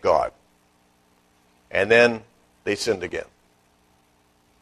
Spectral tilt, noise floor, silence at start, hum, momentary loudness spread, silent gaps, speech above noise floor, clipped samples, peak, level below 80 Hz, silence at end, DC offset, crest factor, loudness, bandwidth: -4 dB/octave; -62 dBFS; 0.05 s; 60 Hz at -50 dBFS; 17 LU; none; 41 dB; under 0.1%; -2 dBFS; -56 dBFS; 1.4 s; under 0.1%; 22 dB; -22 LUFS; 13 kHz